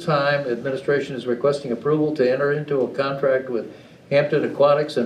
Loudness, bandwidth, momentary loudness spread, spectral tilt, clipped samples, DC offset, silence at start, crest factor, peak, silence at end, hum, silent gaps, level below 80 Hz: -21 LUFS; 10.5 kHz; 7 LU; -7 dB/octave; under 0.1%; under 0.1%; 0 s; 16 dB; -6 dBFS; 0 s; none; none; -66 dBFS